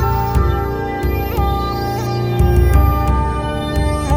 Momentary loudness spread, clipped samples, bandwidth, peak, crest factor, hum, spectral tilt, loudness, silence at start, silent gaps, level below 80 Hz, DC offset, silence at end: 6 LU; under 0.1%; 16 kHz; 0 dBFS; 14 dB; none; -7 dB/octave; -17 LUFS; 0 s; none; -18 dBFS; under 0.1%; 0 s